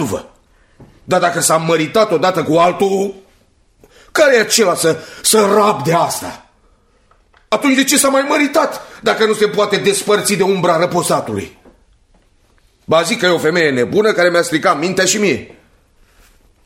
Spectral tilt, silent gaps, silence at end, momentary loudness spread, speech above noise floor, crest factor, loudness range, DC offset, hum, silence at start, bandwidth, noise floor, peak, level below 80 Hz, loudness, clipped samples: -3.5 dB/octave; none; 1.2 s; 9 LU; 40 dB; 16 dB; 3 LU; under 0.1%; none; 0 s; 16.5 kHz; -53 dBFS; 0 dBFS; -54 dBFS; -14 LUFS; under 0.1%